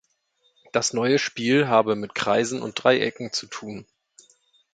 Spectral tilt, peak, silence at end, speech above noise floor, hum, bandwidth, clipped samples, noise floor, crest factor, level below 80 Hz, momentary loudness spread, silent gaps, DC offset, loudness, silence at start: -4 dB/octave; -2 dBFS; 0.9 s; 45 dB; none; 9.4 kHz; under 0.1%; -68 dBFS; 22 dB; -66 dBFS; 14 LU; none; under 0.1%; -23 LUFS; 0.75 s